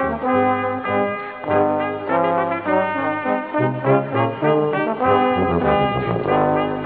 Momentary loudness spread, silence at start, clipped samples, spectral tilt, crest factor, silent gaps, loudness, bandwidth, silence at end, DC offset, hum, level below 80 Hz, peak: 4 LU; 0 s; under 0.1%; -5.5 dB/octave; 16 dB; none; -19 LUFS; 4.7 kHz; 0 s; under 0.1%; none; -46 dBFS; -4 dBFS